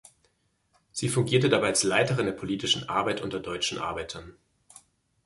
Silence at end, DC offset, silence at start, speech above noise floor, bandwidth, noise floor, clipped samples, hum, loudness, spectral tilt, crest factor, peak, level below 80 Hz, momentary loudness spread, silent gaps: 0.95 s; under 0.1%; 0.95 s; 44 dB; 11.5 kHz; -71 dBFS; under 0.1%; none; -26 LUFS; -4 dB/octave; 20 dB; -8 dBFS; -58 dBFS; 12 LU; none